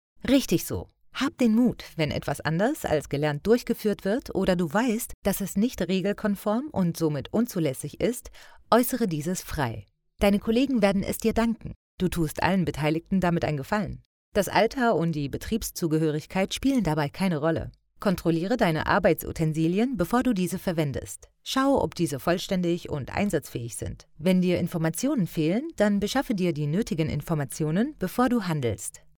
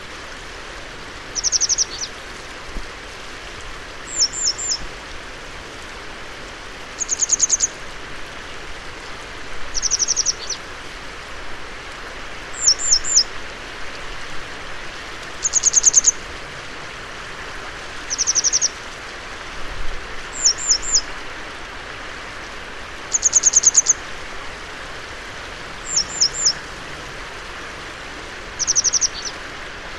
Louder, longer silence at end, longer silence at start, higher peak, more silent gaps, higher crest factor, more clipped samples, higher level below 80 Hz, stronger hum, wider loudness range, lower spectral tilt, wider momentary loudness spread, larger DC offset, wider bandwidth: second, -26 LUFS vs -17 LUFS; first, 0.2 s vs 0 s; first, 0.2 s vs 0 s; second, -6 dBFS vs -2 dBFS; first, 5.14-5.22 s, 11.76-11.98 s, 14.05-14.32 s vs none; about the same, 20 dB vs 22 dB; neither; second, -46 dBFS vs -40 dBFS; neither; second, 2 LU vs 6 LU; first, -6 dB/octave vs 1 dB/octave; second, 7 LU vs 19 LU; neither; first, over 20 kHz vs 13 kHz